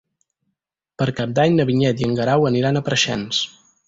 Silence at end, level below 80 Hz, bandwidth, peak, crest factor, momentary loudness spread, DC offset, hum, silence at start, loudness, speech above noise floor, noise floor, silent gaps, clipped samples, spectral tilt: 0.4 s; -54 dBFS; 7.8 kHz; -4 dBFS; 16 dB; 6 LU; under 0.1%; none; 1 s; -19 LUFS; 59 dB; -78 dBFS; none; under 0.1%; -5 dB/octave